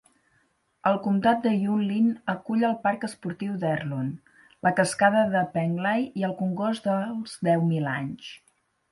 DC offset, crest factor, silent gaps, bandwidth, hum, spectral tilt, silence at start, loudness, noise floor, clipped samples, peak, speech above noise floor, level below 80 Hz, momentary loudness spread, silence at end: under 0.1%; 18 dB; none; 11.5 kHz; none; -6.5 dB/octave; 0.85 s; -26 LUFS; -68 dBFS; under 0.1%; -8 dBFS; 43 dB; -68 dBFS; 10 LU; 0.55 s